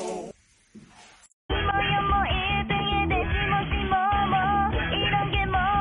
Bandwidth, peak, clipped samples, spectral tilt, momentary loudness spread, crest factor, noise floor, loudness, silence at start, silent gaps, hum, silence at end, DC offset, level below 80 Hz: 11 kHz; -12 dBFS; under 0.1%; -6 dB/octave; 4 LU; 12 dB; -53 dBFS; -24 LUFS; 0 s; 1.33-1.49 s; none; 0 s; under 0.1%; -34 dBFS